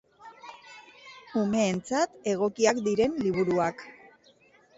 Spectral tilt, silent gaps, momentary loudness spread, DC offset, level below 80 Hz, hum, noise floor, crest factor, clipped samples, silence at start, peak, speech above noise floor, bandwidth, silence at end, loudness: -5 dB/octave; none; 23 LU; under 0.1%; -62 dBFS; none; -60 dBFS; 18 dB; under 0.1%; 0.2 s; -10 dBFS; 34 dB; 8 kHz; 0.85 s; -27 LUFS